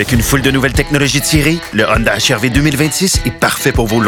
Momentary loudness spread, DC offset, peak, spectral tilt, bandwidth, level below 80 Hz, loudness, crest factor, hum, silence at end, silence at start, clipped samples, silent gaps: 2 LU; under 0.1%; 0 dBFS; -4 dB/octave; 19 kHz; -24 dBFS; -12 LUFS; 12 dB; none; 0 s; 0 s; under 0.1%; none